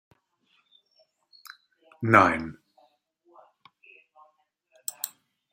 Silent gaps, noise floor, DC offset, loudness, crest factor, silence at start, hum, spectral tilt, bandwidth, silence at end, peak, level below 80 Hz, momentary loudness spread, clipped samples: none; -70 dBFS; under 0.1%; -24 LUFS; 28 dB; 2 s; none; -5 dB/octave; 16 kHz; 0.45 s; -2 dBFS; -66 dBFS; 29 LU; under 0.1%